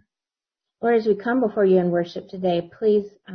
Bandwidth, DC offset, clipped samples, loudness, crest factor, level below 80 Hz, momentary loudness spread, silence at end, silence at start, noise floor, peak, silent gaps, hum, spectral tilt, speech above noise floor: 6.4 kHz; under 0.1%; under 0.1%; -22 LUFS; 14 dB; -66 dBFS; 8 LU; 0 s; 0.8 s; under -90 dBFS; -8 dBFS; none; none; -8.5 dB/octave; over 69 dB